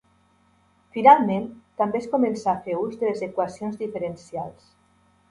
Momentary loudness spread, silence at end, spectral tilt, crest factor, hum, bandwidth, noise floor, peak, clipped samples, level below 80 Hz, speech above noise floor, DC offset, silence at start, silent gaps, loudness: 19 LU; 0.8 s; -7 dB/octave; 22 dB; none; 11 kHz; -62 dBFS; -2 dBFS; under 0.1%; -64 dBFS; 39 dB; under 0.1%; 0.95 s; none; -23 LUFS